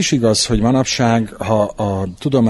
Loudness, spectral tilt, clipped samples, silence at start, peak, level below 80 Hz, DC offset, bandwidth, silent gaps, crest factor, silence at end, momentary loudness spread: -16 LUFS; -5 dB/octave; under 0.1%; 0 s; -2 dBFS; -34 dBFS; under 0.1%; 12 kHz; none; 14 dB; 0 s; 6 LU